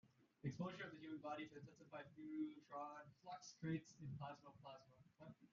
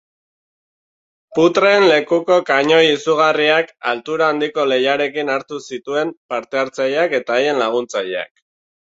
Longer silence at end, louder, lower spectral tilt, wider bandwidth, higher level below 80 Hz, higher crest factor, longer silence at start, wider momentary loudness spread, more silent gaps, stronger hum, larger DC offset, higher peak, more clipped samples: second, 0.05 s vs 0.75 s; second, -54 LUFS vs -16 LUFS; first, -6 dB/octave vs -4 dB/octave; about the same, 7.2 kHz vs 7.8 kHz; second, -84 dBFS vs -64 dBFS; about the same, 18 dB vs 16 dB; second, 0.05 s vs 1.3 s; about the same, 13 LU vs 11 LU; second, none vs 6.17-6.29 s; neither; neither; second, -36 dBFS vs -2 dBFS; neither